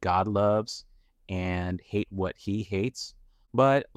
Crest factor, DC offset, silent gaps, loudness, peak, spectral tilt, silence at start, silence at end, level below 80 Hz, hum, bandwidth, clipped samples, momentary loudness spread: 18 dB; under 0.1%; none; -28 LUFS; -10 dBFS; -6.5 dB/octave; 0 s; 0.15 s; -54 dBFS; none; 12.5 kHz; under 0.1%; 14 LU